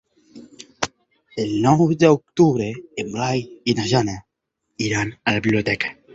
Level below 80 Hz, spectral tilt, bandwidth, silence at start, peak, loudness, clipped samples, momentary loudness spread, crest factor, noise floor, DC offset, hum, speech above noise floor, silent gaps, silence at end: -52 dBFS; -5.5 dB/octave; 8 kHz; 0.35 s; 0 dBFS; -20 LUFS; under 0.1%; 12 LU; 20 dB; -77 dBFS; under 0.1%; none; 57 dB; none; 0.2 s